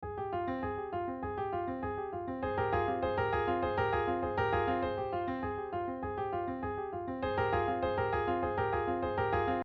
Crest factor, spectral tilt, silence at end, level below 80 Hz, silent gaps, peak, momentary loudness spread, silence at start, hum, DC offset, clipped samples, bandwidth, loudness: 14 dB; -5 dB/octave; 0 s; -50 dBFS; none; -20 dBFS; 6 LU; 0 s; none; under 0.1%; under 0.1%; 6.2 kHz; -34 LUFS